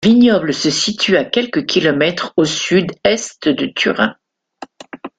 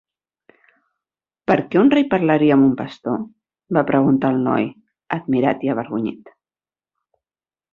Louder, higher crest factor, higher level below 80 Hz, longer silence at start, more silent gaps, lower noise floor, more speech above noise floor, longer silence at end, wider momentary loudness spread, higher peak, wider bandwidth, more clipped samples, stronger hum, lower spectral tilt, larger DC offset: first, -15 LUFS vs -18 LUFS; about the same, 14 dB vs 18 dB; first, -54 dBFS vs -60 dBFS; second, 0 s vs 1.5 s; neither; second, -38 dBFS vs under -90 dBFS; second, 23 dB vs over 73 dB; second, 0.1 s vs 1.55 s; second, 6 LU vs 12 LU; about the same, 0 dBFS vs -2 dBFS; first, 9.4 kHz vs 5.2 kHz; neither; neither; second, -4 dB/octave vs -9 dB/octave; neither